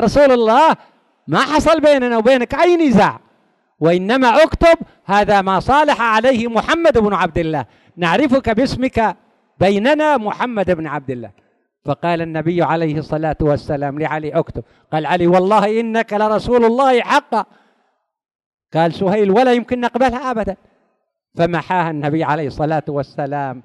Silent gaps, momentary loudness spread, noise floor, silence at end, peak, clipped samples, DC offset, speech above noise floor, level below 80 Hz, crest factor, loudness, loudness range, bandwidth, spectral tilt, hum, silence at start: 18.35-18.39 s, 18.46-18.58 s; 10 LU; -68 dBFS; 0.05 s; -2 dBFS; under 0.1%; under 0.1%; 53 dB; -40 dBFS; 14 dB; -15 LUFS; 6 LU; 12 kHz; -6 dB/octave; none; 0 s